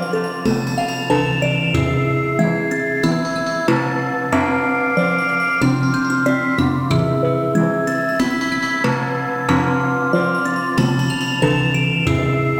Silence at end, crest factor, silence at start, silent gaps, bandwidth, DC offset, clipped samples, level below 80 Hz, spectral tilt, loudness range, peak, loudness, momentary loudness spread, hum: 0 s; 16 dB; 0 s; none; 17.5 kHz; under 0.1%; under 0.1%; -44 dBFS; -6 dB/octave; 1 LU; -2 dBFS; -18 LUFS; 3 LU; none